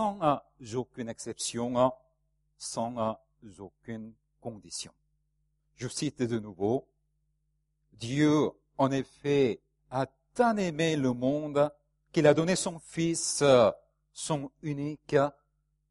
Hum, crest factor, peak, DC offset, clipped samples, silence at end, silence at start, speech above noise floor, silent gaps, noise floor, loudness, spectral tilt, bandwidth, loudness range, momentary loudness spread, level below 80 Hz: none; 22 dB; -8 dBFS; under 0.1%; under 0.1%; 0.6 s; 0 s; 48 dB; none; -77 dBFS; -29 LUFS; -5 dB/octave; 11.5 kHz; 12 LU; 18 LU; -66 dBFS